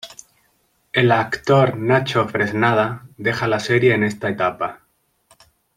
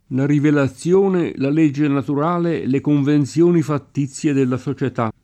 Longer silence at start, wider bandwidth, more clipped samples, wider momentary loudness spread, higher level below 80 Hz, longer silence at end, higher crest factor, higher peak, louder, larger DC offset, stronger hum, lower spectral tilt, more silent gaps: about the same, 0.05 s vs 0.1 s; first, 15 kHz vs 9.8 kHz; neither; about the same, 8 LU vs 6 LU; about the same, -56 dBFS vs -58 dBFS; first, 1 s vs 0.15 s; about the same, 18 dB vs 14 dB; about the same, -2 dBFS vs -4 dBFS; about the same, -19 LUFS vs -18 LUFS; neither; neither; second, -6 dB/octave vs -7.5 dB/octave; neither